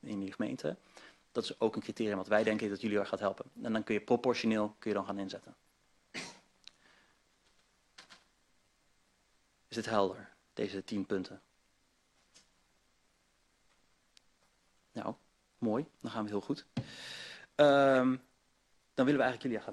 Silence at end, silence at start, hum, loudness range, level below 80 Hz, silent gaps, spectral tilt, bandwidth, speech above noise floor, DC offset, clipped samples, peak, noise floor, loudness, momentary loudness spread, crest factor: 0 s; 0.05 s; none; 19 LU; -74 dBFS; none; -5.5 dB/octave; 12 kHz; 40 dB; under 0.1%; under 0.1%; -12 dBFS; -73 dBFS; -34 LUFS; 15 LU; 24 dB